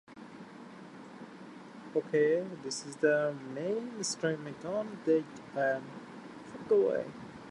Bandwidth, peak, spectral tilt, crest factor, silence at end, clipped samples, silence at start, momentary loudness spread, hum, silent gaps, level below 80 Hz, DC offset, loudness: 11.5 kHz; -16 dBFS; -4.5 dB/octave; 18 dB; 0 s; under 0.1%; 0.1 s; 21 LU; none; none; -76 dBFS; under 0.1%; -32 LUFS